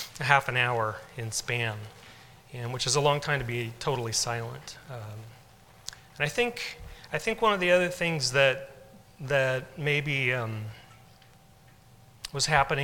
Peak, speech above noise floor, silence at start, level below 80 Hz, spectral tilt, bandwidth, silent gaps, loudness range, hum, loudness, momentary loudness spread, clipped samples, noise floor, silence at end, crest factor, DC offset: -4 dBFS; 28 dB; 0 s; -54 dBFS; -3.5 dB/octave; 18 kHz; none; 6 LU; none; -27 LUFS; 19 LU; under 0.1%; -56 dBFS; 0 s; 26 dB; under 0.1%